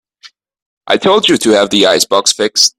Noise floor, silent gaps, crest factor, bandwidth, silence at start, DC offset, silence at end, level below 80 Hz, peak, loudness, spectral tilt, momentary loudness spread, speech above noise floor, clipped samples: -43 dBFS; 0.62-0.81 s; 12 dB; over 20 kHz; 0.25 s; under 0.1%; 0.1 s; -54 dBFS; 0 dBFS; -10 LUFS; -2 dB/octave; 3 LU; 32 dB; under 0.1%